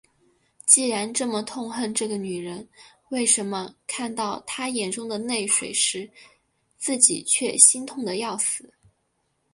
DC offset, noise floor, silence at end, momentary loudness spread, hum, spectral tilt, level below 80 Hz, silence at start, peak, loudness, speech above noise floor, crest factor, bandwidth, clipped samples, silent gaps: under 0.1%; -72 dBFS; 0.9 s; 16 LU; none; -1.5 dB/octave; -70 dBFS; 0.65 s; 0 dBFS; -22 LUFS; 48 dB; 26 dB; 11.5 kHz; under 0.1%; none